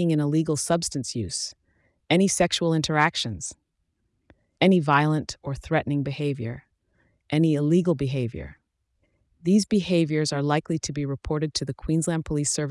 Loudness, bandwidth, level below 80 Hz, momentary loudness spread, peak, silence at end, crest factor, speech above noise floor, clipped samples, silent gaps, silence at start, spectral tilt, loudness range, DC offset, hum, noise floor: -24 LUFS; 12 kHz; -50 dBFS; 11 LU; -6 dBFS; 0 s; 18 dB; 51 dB; under 0.1%; none; 0 s; -5 dB/octave; 2 LU; under 0.1%; none; -74 dBFS